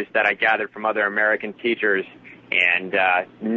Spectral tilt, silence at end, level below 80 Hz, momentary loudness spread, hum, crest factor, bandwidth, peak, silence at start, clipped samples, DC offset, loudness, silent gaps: -5.5 dB/octave; 0 s; -72 dBFS; 6 LU; none; 18 dB; 7.6 kHz; -4 dBFS; 0 s; under 0.1%; under 0.1%; -20 LUFS; none